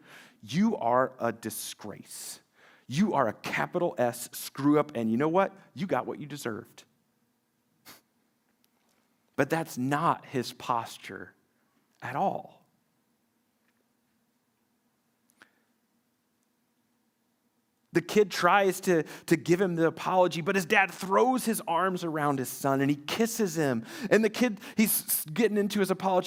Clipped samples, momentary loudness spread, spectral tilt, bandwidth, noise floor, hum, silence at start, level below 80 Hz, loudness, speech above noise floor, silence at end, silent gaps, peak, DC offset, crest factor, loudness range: under 0.1%; 13 LU; -5 dB/octave; over 20 kHz; -74 dBFS; none; 0.1 s; -74 dBFS; -28 LUFS; 46 dB; 0 s; none; -8 dBFS; under 0.1%; 22 dB; 13 LU